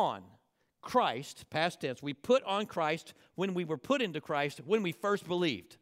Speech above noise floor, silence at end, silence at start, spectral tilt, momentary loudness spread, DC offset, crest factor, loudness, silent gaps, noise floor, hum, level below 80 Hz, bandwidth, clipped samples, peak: 37 dB; 0.1 s; 0 s; -5 dB/octave; 9 LU; under 0.1%; 20 dB; -33 LUFS; none; -70 dBFS; none; -76 dBFS; 16 kHz; under 0.1%; -14 dBFS